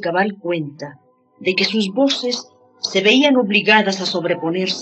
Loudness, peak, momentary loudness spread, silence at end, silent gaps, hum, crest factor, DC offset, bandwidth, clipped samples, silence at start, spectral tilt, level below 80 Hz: -17 LUFS; -2 dBFS; 13 LU; 0 s; none; none; 18 dB; under 0.1%; 8.6 kHz; under 0.1%; 0 s; -4 dB/octave; -76 dBFS